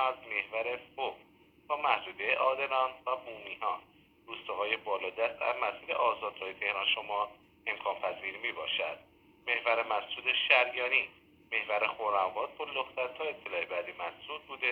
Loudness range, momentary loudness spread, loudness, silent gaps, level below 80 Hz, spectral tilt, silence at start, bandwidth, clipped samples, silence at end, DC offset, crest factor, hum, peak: 4 LU; 10 LU; -32 LUFS; none; -74 dBFS; -4 dB/octave; 0 s; 14.5 kHz; under 0.1%; 0 s; under 0.1%; 24 dB; none; -10 dBFS